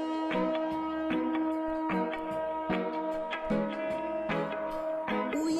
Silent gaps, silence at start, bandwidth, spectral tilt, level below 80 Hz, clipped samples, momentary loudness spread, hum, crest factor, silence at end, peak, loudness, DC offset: none; 0 s; 12.5 kHz; -6 dB/octave; -58 dBFS; under 0.1%; 4 LU; none; 12 dB; 0 s; -18 dBFS; -32 LUFS; under 0.1%